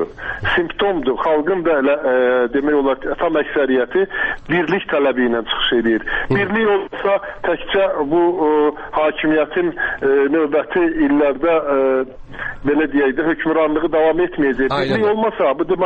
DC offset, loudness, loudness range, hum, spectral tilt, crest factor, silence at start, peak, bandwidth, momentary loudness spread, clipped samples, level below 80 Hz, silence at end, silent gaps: under 0.1%; -17 LUFS; 1 LU; none; -7.5 dB/octave; 10 dB; 0 s; -6 dBFS; 5.6 kHz; 4 LU; under 0.1%; -40 dBFS; 0 s; none